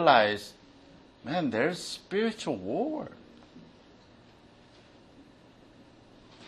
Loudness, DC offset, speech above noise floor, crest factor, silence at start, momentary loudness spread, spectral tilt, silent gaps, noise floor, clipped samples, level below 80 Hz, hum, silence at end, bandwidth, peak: -30 LUFS; under 0.1%; 29 dB; 26 dB; 0 s; 27 LU; -4.5 dB/octave; none; -56 dBFS; under 0.1%; -68 dBFS; none; 0 s; 12.5 kHz; -6 dBFS